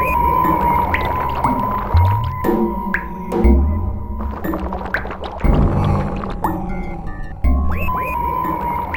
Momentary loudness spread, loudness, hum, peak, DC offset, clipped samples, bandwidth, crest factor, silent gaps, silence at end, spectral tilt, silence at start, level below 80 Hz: 10 LU; -19 LUFS; none; 0 dBFS; 0.9%; under 0.1%; 17.5 kHz; 16 dB; none; 0 s; -8 dB/octave; 0 s; -22 dBFS